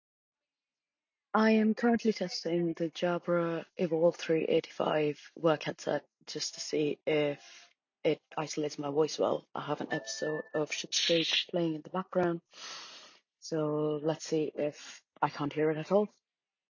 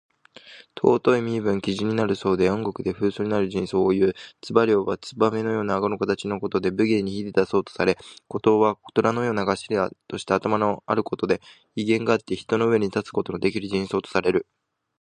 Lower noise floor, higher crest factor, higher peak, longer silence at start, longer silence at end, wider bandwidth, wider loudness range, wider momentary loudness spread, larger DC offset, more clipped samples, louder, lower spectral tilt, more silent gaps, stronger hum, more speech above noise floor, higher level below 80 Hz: first, under -90 dBFS vs -48 dBFS; about the same, 20 dB vs 20 dB; second, -12 dBFS vs -2 dBFS; first, 1.35 s vs 0.45 s; about the same, 0.65 s vs 0.6 s; second, 7.6 kHz vs 9.8 kHz; first, 4 LU vs 1 LU; first, 10 LU vs 6 LU; neither; neither; second, -32 LUFS vs -23 LUFS; second, -4.5 dB/octave vs -6.5 dB/octave; neither; neither; first, over 59 dB vs 25 dB; second, -78 dBFS vs -56 dBFS